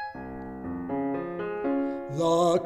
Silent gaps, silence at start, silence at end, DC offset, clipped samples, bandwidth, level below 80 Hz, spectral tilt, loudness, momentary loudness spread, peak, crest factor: none; 0 s; 0 s; under 0.1%; under 0.1%; 12.5 kHz; -56 dBFS; -6 dB/octave; -29 LUFS; 14 LU; -14 dBFS; 16 dB